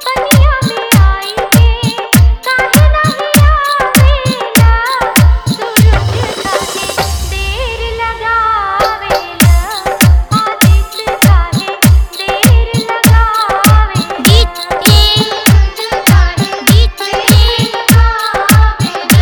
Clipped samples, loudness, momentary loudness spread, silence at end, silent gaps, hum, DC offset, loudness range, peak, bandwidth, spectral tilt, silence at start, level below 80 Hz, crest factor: 1%; -10 LUFS; 7 LU; 0 s; none; none; under 0.1%; 4 LU; 0 dBFS; over 20 kHz; -4.5 dB/octave; 0 s; -14 dBFS; 8 dB